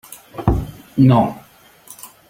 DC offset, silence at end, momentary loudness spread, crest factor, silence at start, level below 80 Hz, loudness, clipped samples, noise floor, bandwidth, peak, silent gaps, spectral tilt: under 0.1%; 0.25 s; 24 LU; 16 dB; 0.1 s; -32 dBFS; -17 LUFS; under 0.1%; -45 dBFS; 16.5 kHz; -2 dBFS; none; -8 dB/octave